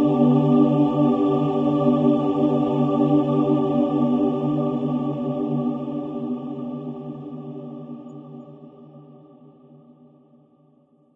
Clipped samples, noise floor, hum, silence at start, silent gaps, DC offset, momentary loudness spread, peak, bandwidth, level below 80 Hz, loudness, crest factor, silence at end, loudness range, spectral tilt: under 0.1%; -58 dBFS; none; 0 s; none; under 0.1%; 18 LU; -6 dBFS; 3.8 kHz; -60 dBFS; -21 LUFS; 16 dB; 2 s; 19 LU; -10.5 dB/octave